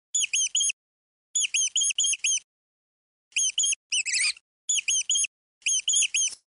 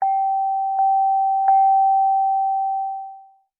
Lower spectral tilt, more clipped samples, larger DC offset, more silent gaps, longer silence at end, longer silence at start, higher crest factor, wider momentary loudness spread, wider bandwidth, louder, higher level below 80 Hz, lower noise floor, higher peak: second, 7.5 dB/octave vs -4.5 dB/octave; neither; neither; first, 0.73-1.34 s, 2.44-3.31 s, 3.76-3.90 s, 4.41-4.68 s, 5.27-5.61 s vs none; second, 0.15 s vs 0.4 s; first, 0.15 s vs 0 s; first, 16 dB vs 10 dB; about the same, 8 LU vs 10 LU; first, 11 kHz vs 2.3 kHz; second, -24 LUFS vs -19 LUFS; first, -82 dBFS vs under -90 dBFS; first, under -90 dBFS vs -44 dBFS; second, -12 dBFS vs -8 dBFS